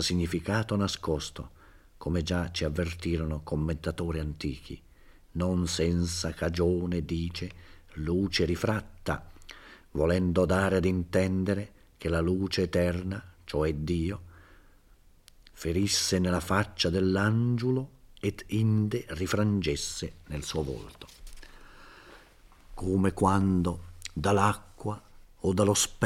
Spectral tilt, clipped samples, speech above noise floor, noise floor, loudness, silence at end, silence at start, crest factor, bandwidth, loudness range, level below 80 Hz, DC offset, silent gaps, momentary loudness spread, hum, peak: -5 dB/octave; under 0.1%; 30 dB; -58 dBFS; -29 LUFS; 0 s; 0 s; 22 dB; 16 kHz; 5 LU; -48 dBFS; under 0.1%; none; 14 LU; none; -8 dBFS